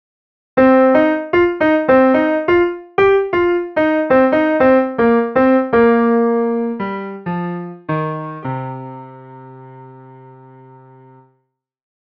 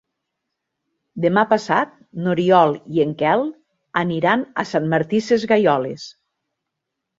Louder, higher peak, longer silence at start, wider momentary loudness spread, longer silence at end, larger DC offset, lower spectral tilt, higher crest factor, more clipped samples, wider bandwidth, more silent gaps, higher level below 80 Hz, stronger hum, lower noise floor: first, -15 LUFS vs -19 LUFS; about the same, 0 dBFS vs -2 dBFS; second, 0.55 s vs 1.15 s; about the same, 13 LU vs 12 LU; first, 2.2 s vs 1.1 s; neither; first, -9 dB/octave vs -6.5 dB/octave; about the same, 16 dB vs 18 dB; neither; second, 5.8 kHz vs 7.8 kHz; neither; first, -48 dBFS vs -62 dBFS; neither; second, -68 dBFS vs -80 dBFS